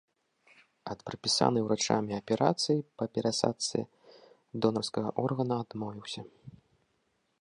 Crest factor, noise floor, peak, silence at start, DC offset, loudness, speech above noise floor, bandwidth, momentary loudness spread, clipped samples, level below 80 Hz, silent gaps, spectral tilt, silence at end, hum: 24 dB; -76 dBFS; -8 dBFS; 0.85 s; under 0.1%; -31 LUFS; 45 dB; 11 kHz; 15 LU; under 0.1%; -70 dBFS; none; -4.5 dB/octave; 0.9 s; none